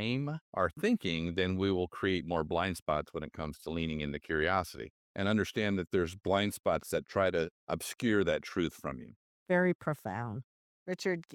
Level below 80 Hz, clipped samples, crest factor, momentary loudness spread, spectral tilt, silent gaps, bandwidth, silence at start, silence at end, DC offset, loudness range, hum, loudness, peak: -56 dBFS; under 0.1%; 18 dB; 11 LU; -5.5 dB/octave; 0.41-0.53 s, 2.82-2.86 s, 4.90-5.15 s, 6.59-6.64 s, 7.51-7.67 s, 9.16-9.46 s, 9.75-9.79 s, 10.44-10.86 s; 17.5 kHz; 0 s; 0 s; under 0.1%; 2 LU; none; -33 LUFS; -14 dBFS